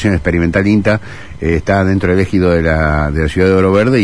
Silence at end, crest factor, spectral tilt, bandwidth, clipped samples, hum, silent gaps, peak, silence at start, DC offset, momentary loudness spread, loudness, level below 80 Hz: 0 s; 12 dB; -7.5 dB/octave; 10.5 kHz; under 0.1%; none; none; 0 dBFS; 0 s; 2%; 6 LU; -13 LUFS; -26 dBFS